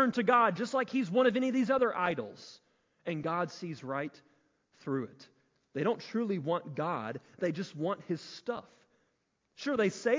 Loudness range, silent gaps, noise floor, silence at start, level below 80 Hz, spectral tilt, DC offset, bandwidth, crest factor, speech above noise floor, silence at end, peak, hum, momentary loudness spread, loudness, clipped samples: 8 LU; none; -78 dBFS; 0 s; -76 dBFS; -6 dB/octave; under 0.1%; 7.6 kHz; 20 dB; 46 dB; 0 s; -12 dBFS; none; 15 LU; -33 LUFS; under 0.1%